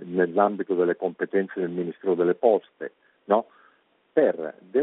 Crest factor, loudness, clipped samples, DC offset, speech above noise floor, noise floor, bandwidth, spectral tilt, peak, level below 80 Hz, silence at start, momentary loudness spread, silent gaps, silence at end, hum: 20 dB; -25 LUFS; under 0.1%; under 0.1%; 39 dB; -63 dBFS; 4 kHz; -6 dB/octave; -6 dBFS; -78 dBFS; 0 s; 11 LU; none; 0 s; none